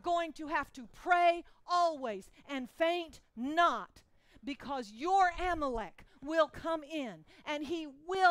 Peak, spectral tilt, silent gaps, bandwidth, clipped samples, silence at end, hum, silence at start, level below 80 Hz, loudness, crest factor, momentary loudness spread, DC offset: -14 dBFS; -4 dB/octave; none; 13 kHz; under 0.1%; 0 s; none; 0.05 s; -56 dBFS; -34 LUFS; 20 dB; 16 LU; under 0.1%